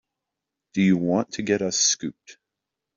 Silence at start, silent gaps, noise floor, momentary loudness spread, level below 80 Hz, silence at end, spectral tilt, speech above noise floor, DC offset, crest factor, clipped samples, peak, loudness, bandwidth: 0.75 s; none; -85 dBFS; 9 LU; -64 dBFS; 0.65 s; -3.5 dB/octave; 62 dB; under 0.1%; 18 dB; under 0.1%; -8 dBFS; -22 LUFS; 7.6 kHz